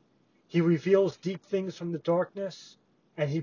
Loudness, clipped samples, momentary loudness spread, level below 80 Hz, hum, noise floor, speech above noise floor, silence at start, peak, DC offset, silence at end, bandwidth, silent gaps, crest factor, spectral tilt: -29 LUFS; under 0.1%; 14 LU; -74 dBFS; none; -67 dBFS; 39 dB; 0.55 s; -10 dBFS; under 0.1%; 0 s; 7.2 kHz; none; 18 dB; -7.5 dB/octave